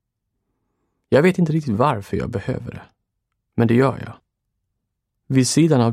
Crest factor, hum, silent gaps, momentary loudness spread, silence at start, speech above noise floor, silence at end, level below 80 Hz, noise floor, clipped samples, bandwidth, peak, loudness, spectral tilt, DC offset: 18 dB; none; none; 15 LU; 1.1 s; 59 dB; 0 s; -50 dBFS; -77 dBFS; under 0.1%; 15.5 kHz; -4 dBFS; -19 LUFS; -6 dB/octave; under 0.1%